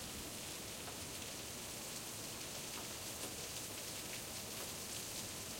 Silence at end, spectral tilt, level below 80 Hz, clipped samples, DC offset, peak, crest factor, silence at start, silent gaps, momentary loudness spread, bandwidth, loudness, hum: 0 s; -2 dB/octave; -66 dBFS; under 0.1%; under 0.1%; -30 dBFS; 16 dB; 0 s; none; 2 LU; 16.5 kHz; -44 LUFS; none